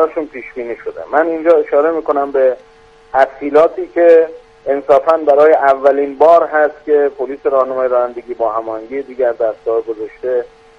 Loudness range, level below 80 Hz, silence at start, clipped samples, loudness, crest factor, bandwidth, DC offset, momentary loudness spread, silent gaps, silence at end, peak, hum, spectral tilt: 6 LU; -54 dBFS; 0 s; under 0.1%; -13 LUFS; 14 dB; 6.6 kHz; under 0.1%; 14 LU; none; 0.3 s; 0 dBFS; none; -6 dB/octave